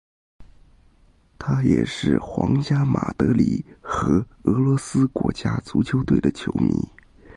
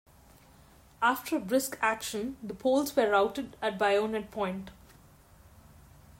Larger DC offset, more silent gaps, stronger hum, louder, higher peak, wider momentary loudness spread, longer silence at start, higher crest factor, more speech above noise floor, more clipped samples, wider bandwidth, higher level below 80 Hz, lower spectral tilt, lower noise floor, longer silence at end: neither; neither; neither; first, -22 LUFS vs -30 LUFS; first, -4 dBFS vs -12 dBFS; second, 6 LU vs 9 LU; second, 0.4 s vs 1 s; about the same, 18 dB vs 20 dB; first, 35 dB vs 28 dB; neither; second, 11.5 kHz vs 16 kHz; first, -42 dBFS vs -62 dBFS; first, -7.5 dB/octave vs -4 dB/octave; about the same, -56 dBFS vs -57 dBFS; second, 0.5 s vs 1.5 s